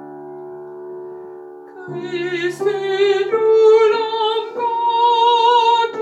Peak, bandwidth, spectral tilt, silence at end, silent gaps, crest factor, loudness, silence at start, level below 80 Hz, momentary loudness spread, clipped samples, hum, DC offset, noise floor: -4 dBFS; 8.6 kHz; -4 dB/octave; 0 s; none; 14 dB; -15 LUFS; 0 s; -78 dBFS; 21 LU; under 0.1%; none; under 0.1%; -36 dBFS